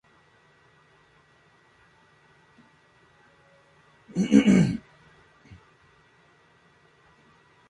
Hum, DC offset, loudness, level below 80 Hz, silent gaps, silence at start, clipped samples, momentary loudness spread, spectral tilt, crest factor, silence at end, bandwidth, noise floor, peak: none; under 0.1%; -22 LUFS; -60 dBFS; none; 4.15 s; under 0.1%; 17 LU; -7 dB/octave; 26 dB; 2.9 s; 11 kHz; -60 dBFS; -4 dBFS